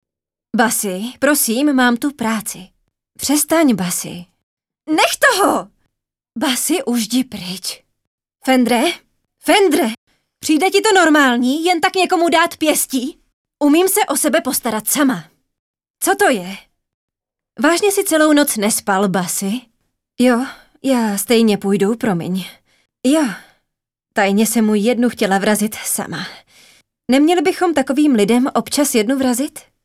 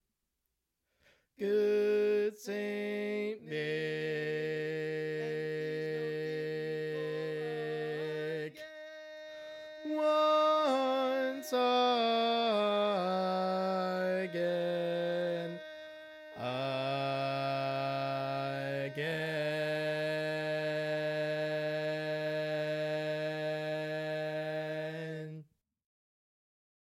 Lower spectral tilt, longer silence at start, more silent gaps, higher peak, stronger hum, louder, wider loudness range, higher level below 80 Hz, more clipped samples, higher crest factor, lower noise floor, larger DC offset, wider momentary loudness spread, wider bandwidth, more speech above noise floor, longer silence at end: second, -3.5 dB/octave vs -5.5 dB/octave; second, 0.55 s vs 1.4 s; first, 4.43-4.57 s, 8.07-8.18 s, 9.98-10.07 s, 13.33-13.45 s, 15.59-15.74 s, 15.90-15.94 s, 16.94-17.08 s vs none; first, 0 dBFS vs -18 dBFS; neither; first, -16 LUFS vs -34 LUFS; second, 4 LU vs 7 LU; first, -60 dBFS vs -84 dBFS; neither; about the same, 16 dB vs 16 dB; about the same, -85 dBFS vs -85 dBFS; neither; about the same, 12 LU vs 12 LU; about the same, 16.5 kHz vs 16.5 kHz; first, 70 dB vs 52 dB; second, 0.25 s vs 1.45 s